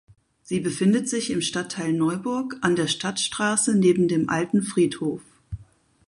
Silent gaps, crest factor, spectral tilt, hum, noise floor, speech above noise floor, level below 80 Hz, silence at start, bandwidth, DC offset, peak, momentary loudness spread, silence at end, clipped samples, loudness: none; 18 dB; -4.5 dB/octave; none; -54 dBFS; 31 dB; -54 dBFS; 0.5 s; 11.5 kHz; under 0.1%; -6 dBFS; 11 LU; 0.45 s; under 0.1%; -23 LUFS